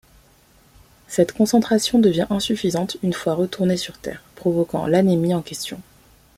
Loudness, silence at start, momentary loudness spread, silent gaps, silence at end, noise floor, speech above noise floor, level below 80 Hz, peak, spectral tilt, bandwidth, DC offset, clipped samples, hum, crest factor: -20 LUFS; 1.1 s; 13 LU; none; 0.55 s; -54 dBFS; 34 dB; -52 dBFS; -4 dBFS; -5.5 dB/octave; 16 kHz; under 0.1%; under 0.1%; none; 18 dB